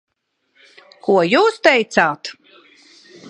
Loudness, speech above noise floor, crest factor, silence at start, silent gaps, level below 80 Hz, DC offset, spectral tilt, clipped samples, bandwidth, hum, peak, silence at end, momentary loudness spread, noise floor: -15 LUFS; 53 dB; 20 dB; 1.05 s; none; -66 dBFS; under 0.1%; -4.5 dB/octave; under 0.1%; 10.5 kHz; none; 0 dBFS; 0 s; 15 LU; -68 dBFS